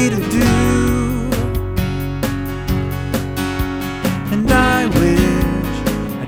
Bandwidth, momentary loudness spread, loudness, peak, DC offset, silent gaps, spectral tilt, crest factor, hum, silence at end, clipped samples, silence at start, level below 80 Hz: 17.5 kHz; 8 LU; -17 LUFS; 0 dBFS; under 0.1%; none; -6 dB/octave; 16 dB; none; 0 s; under 0.1%; 0 s; -26 dBFS